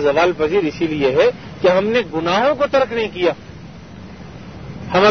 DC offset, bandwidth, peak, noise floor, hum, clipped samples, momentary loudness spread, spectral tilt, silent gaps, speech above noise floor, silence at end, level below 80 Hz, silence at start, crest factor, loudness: 0.4%; 6.6 kHz; 0 dBFS; -36 dBFS; none; under 0.1%; 21 LU; -6 dB/octave; none; 19 dB; 0 s; -46 dBFS; 0 s; 16 dB; -17 LUFS